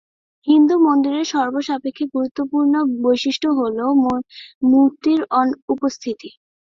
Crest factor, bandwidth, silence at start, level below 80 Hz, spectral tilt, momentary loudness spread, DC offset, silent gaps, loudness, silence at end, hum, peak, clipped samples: 14 dB; 7.4 kHz; 0.45 s; -60 dBFS; -4.5 dB/octave; 10 LU; under 0.1%; 2.31-2.35 s, 4.55-4.61 s, 5.62-5.68 s; -18 LUFS; 0.4 s; none; -4 dBFS; under 0.1%